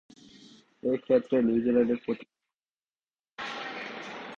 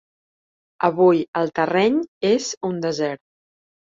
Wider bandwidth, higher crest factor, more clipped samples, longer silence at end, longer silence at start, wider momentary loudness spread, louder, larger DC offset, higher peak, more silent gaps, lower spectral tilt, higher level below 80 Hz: about the same, 7.2 kHz vs 7.8 kHz; about the same, 18 dB vs 18 dB; neither; second, 0 s vs 0.8 s; about the same, 0.85 s vs 0.8 s; first, 14 LU vs 9 LU; second, -29 LUFS vs -20 LUFS; neither; second, -12 dBFS vs -4 dBFS; second, 2.73-2.77 s vs 1.28-1.33 s, 2.08-2.21 s, 2.57-2.61 s; first, -6.5 dB/octave vs -5 dB/octave; about the same, -66 dBFS vs -66 dBFS